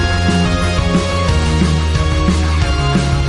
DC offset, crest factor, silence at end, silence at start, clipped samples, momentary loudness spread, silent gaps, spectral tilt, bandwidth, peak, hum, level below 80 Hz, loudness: under 0.1%; 12 dB; 0 s; 0 s; under 0.1%; 1 LU; none; -5.5 dB/octave; 11.5 kHz; -2 dBFS; none; -18 dBFS; -15 LUFS